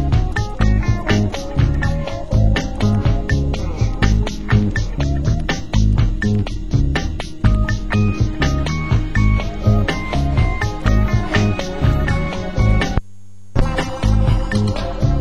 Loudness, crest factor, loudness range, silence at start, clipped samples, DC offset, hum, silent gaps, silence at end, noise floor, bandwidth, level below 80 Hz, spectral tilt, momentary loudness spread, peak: -19 LUFS; 16 dB; 1 LU; 0 s; under 0.1%; 3%; none; none; 0 s; -44 dBFS; 11 kHz; -20 dBFS; -6.5 dB/octave; 4 LU; 0 dBFS